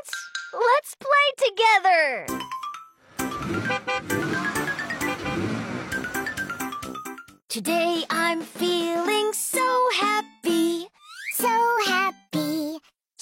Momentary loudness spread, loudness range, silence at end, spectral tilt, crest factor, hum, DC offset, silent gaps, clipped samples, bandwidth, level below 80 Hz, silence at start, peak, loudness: 14 LU; 6 LU; 0.4 s; -3 dB/octave; 16 dB; none; under 0.1%; 7.44-7.48 s; under 0.1%; 16.5 kHz; -58 dBFS; 0.05 s; -8 dBFS; -24 LUFS